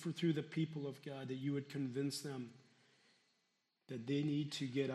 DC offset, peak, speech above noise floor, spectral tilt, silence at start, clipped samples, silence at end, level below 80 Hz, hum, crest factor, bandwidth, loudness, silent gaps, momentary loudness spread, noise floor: under 0.1%; -26 dBFS; 43 dB; -6 dB/octave; 0 s; under 0.1%; 0 s; -86 dBFS; none; 18 dB; 13.5 kHz; -42 LUFS; none; 10 LU; -83 dBFS